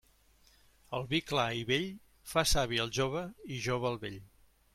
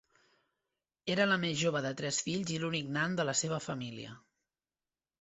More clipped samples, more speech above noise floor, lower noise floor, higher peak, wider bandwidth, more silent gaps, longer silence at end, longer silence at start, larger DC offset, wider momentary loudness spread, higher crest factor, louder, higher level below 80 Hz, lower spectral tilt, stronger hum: neither; second, 32 dB vs over 56 dB; second, -65 dBFS vs under -90 dBFS; about the same, -14 dBFS vs -14 dBFS; first, 16 kHz vs 8.2 kHz; neither; second, 0.5 s vs 1 s; second, 0.9 s vs 1.05 s; neither; about the same, 12 LU vs 13 LU; about the same, 20 dB vs 22 dB; about the same, -33 LUFS vs -33 LUFS; first, -50 dBFS vs -72 dBFS; about the same, -4 dB/octave vs -3.5 dB/octave; neither